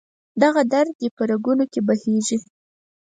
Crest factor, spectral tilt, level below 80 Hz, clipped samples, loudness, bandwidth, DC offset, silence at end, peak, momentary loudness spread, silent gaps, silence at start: 18 dB; -5 dB/octave; -68 dBFS; under 0.1%; -20 LUFS; 9.4 kHz; under 0.1%; 0.6 s; -2 dBFS; 7 LU; 0.95-0.99 s, 1.11-1.17 s; 0.35 s